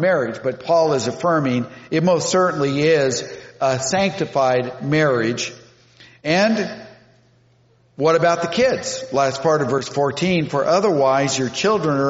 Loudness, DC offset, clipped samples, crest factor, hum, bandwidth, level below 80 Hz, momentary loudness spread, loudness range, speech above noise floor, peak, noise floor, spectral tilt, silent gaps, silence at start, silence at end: -19 LUFS; under 0.1%; under 0.1%; 16 dB; none; 8 kHz; -58 dBFS; 7 LU; 3 LU; 38 dB; -4 dBFS; -56 dBFS; -4.5 dB/octave; none; 0 s; 0 s